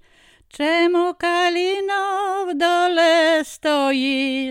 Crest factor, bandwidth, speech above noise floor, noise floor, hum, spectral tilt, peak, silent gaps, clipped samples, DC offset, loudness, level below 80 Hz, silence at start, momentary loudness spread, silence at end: 14 dB; 16 kHz; 35 dB; -53 dBFS; none; -1.5 dB/octave; -6 dBFS; none; under 0.1%; under 0.1%; -19 LUFS; -62 dBFS; 0.55 s; 6 LU; 0 s